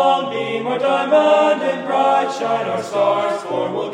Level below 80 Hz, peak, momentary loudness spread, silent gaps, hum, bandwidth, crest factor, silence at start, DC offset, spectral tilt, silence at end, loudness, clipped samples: -68 dBFS; -2 dBFS; 8 LU; none; none; 10.5 kHz; 14 dB; 0 s; under 0.1%; -4.5 dB/octave; 0 s; -18 LUFS; under 0.1%